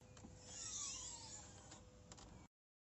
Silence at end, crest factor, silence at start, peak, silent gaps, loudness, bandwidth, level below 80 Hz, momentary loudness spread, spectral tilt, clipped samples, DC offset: 0.35 s; 20 dB; 0 s; -36 dBFS; none; -51 LUFS; 8.2 kHz; -70 dBFS; 15 LU; -1.5 dB/octave; under 0.1%; under 0.1%